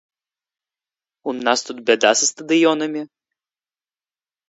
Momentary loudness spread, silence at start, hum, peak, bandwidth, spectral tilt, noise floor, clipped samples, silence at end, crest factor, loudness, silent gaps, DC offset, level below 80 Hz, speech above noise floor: 15 LU; 1.25 s; none; 0 dBFS; 8 kHz; -2 dB/octave; under -90 dBFS; under 0.1%; 1.45 s; 22 dB; -18 LUFS; none; under 0.1%; -74 dBFS; over 72 dB